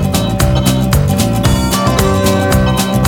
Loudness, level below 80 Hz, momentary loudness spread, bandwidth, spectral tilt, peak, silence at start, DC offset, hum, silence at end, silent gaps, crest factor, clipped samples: -12 LUFS; -20 dBFS; 1 LU; 20 kHz; -5.5 dB/octave; 0 dBFS; 0 s; under 0.1%; none; 0 s; none; 12 dB; under 0.1%